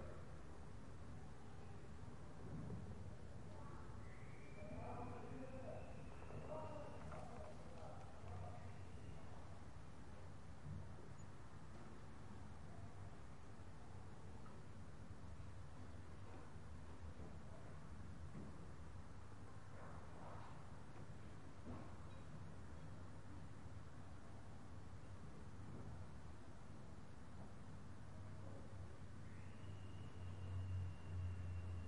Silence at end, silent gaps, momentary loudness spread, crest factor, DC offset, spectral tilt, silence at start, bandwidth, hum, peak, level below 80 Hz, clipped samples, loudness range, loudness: 0 s; none; 7 LU; 16 dB; 0.2%; -7 dB/octave; 0 s; 11 kHz; none; -38 dBFS; -66 dBFS; under 0.1%; 4 LU; -57 LUFS